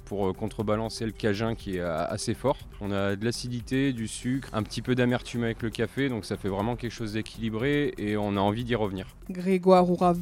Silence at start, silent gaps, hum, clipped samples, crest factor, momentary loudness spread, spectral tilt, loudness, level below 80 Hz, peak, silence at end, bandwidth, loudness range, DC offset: 0 s; none; none; under 0.1%; 20 dB; 8 LU; -6 dB/octave; -28 LUFS; -48 dBFS; -8 dBFS; 0 s; 16 kHz; 3 LU; under 0.1%